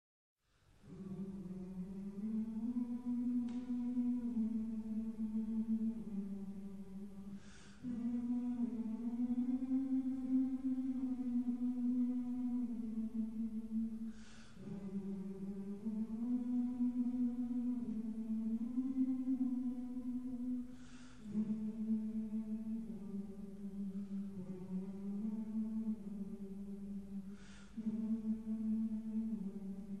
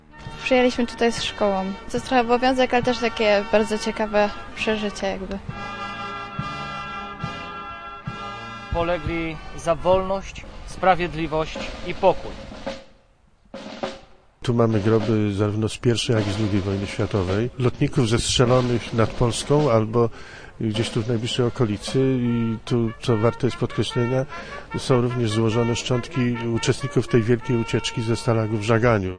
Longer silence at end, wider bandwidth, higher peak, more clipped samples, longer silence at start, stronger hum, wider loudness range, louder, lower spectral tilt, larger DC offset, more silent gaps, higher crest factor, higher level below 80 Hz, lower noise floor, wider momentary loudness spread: about the same, 0 s vs 0 s; second, 9 kHz vs 10.5 kHz; second, -26 dBFS vs -4 dBFS; neither; first, 0.35 s vs 0.15 s; neither; about the same, 5 LU vs 7 LU; second, -41 LUFS vs -23 LUFS; first, -9 dB/octave vs -5.5 dB/octave; first, 0.2% vs under 0.1%; neither; second, 14 dB vs 20 dB; second, -66 dBFS vs -42 dBFS; first, -69 dBFS vs -56 dBFS; about the same, 11 LU vs 13 LU